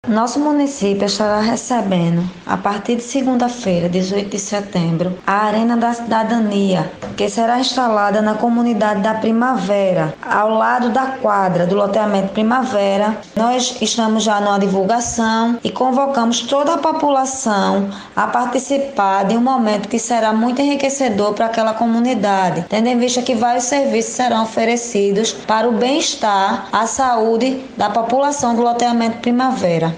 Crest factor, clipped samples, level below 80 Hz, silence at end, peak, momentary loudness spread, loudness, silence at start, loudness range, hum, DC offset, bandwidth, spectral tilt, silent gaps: 14 dB; under 0.1%; -54 dBFS; 0 s; 0 dBFS; 4 LU; -16 LUFS; 0.05 s; 2 LU; none; under 0.1%; 10 kHz; -4.5 dB/octave; none